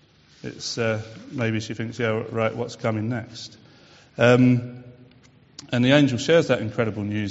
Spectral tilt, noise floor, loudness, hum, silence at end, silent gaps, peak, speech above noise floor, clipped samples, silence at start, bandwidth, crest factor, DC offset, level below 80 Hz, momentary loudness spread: -5.5 dB/octave; -54 dBFS; -22 LUFS; none; 0 s; none; -2 dBFS; 31 dB; under 0.1%; 0.45 s; 8 kHz; 22 dB; under 0.1%; -58 dBFS; 21 LU